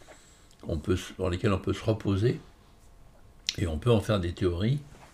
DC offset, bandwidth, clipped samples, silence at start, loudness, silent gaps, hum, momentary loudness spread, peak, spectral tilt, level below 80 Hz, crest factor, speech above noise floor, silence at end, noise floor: under 0.1%; 14.5 kHz; under 0.1%; 0.1 s; -29 LUFS; none; none; 9 LU; -4 dBFS; -6.5 dB/octave; -46 dBFS; 26 dB; 27 dB; 0.1 s; -55 dBFS